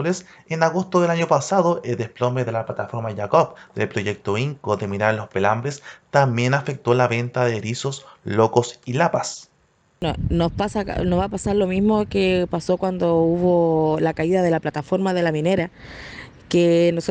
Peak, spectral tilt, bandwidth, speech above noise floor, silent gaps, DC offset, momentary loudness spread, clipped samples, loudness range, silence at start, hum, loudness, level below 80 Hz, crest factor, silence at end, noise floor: -2 dBFS; -6 dB/octave; 9.4 kHz; 41 dB; none; under 0.1%; 9 LU; under 0.1%; 3 LU; 0 s; none; -21 LUFS; -44 dBFS; 18 dB; 0 s; -61 dBFS